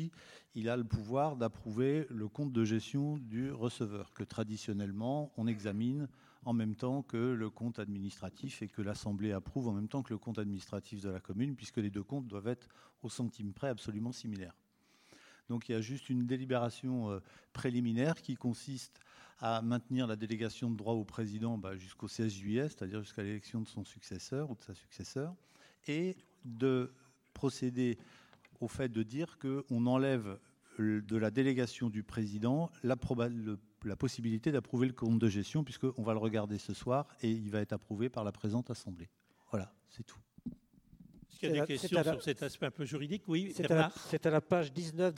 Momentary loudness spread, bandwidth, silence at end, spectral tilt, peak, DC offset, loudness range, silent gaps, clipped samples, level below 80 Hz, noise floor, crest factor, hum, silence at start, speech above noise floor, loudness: 12 LU; 14 kHz; 0 s; -6.5 dB/octave; -14 dBFS; under 0.1%; 6 LU; none; under 0.1%; -66 dBFS; -68 dBFS; 24 dB; none; 0 s; 32 dB; -37 LUFS